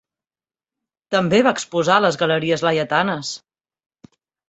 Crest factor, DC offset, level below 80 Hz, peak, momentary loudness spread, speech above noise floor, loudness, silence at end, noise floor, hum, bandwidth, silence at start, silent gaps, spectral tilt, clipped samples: 20 dB; under 0.1%; -60 dBFS; -2 dBFS; 9 LU; over 72 dB; -18 LUFS; 1.1 s; under -90 dBFS; none; 8.2 kHz; 1.1 s; none; -4.5 dB/octave; under 0.1%